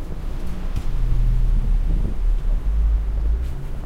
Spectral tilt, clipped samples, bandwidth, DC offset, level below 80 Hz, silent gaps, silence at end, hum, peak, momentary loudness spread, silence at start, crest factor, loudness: -8 dB/octave; under 0.1%; 4.4 kHz; under 0.1%; -20 dBFS; none; 0 s; none; -8 dBFS; 8 LU; 0 s; 10 dB; -25 LUFS